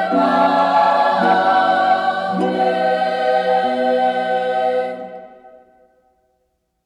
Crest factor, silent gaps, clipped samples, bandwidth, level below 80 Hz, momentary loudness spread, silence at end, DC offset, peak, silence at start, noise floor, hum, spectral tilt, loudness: 14 dB; none; under 0.1%; 10.5 kHz; -66 dBFS; 6 LU; 1.4 s; under 0.1%; -4 dBFS; 0 s; -68 dBFS; none; -6 dB/octave; -16 LUFS